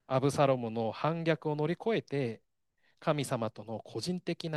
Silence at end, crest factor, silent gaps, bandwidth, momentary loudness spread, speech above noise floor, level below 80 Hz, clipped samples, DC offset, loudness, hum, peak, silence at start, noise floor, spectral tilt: 0 s; 18 dB; none; 12.5 kHz; 10 LU; 43 dB; -74 dBFS; under 0.1%; under 0.1%; -33 LUFS; none; -14 dBFS; 0.1 s; -75 dBFS; -6 dB/octave